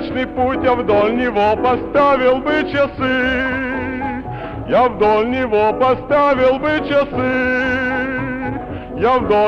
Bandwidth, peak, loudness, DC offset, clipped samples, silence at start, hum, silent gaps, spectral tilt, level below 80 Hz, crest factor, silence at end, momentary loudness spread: 7 kHz; -4 dBFS; -16 LUFS; under 0.1%; under 0.1%; 0 s; none; none; -7 dB/octave; -38 dBFS; 12 dB; 0 s; 9 LU